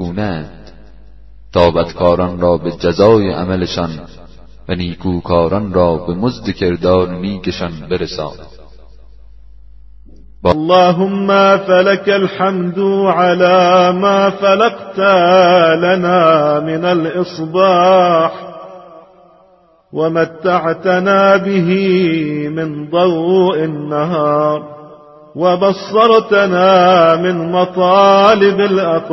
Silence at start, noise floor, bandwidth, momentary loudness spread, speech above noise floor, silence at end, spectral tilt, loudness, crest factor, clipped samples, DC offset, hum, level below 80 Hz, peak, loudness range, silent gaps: 0 s; -49 dBFS; 6.2 kHz; 11 LU; 38 dB; 0 s; -7 dB/octave; -12 LUFS; 12 dB; under 0.1%; under 0.1%; none; -42 dBFS; 0 dBFS; 7 LU; none